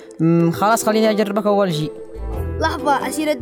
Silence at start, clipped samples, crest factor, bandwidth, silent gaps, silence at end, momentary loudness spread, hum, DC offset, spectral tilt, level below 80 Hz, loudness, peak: 0 s; under 0.1%; 14 dB; 20 kHz; none; 0 s; 11 LU; none; under 0.1%; -5.5 dB/octave; -36 dBFS; -18 LUFS; -4 dBFS